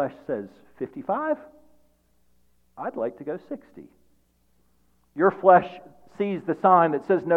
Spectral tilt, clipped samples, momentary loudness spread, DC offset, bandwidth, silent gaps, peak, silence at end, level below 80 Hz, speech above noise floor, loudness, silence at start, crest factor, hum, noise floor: -9 dB/octave; under 0.1%; 21 LU; under 0.1%; 5.2 kHz; none; -2 dBFS; 0 s; -68 dBFS; 44 dB; -24 LUFS; 0 s; 22 dB; none; -67 dBFS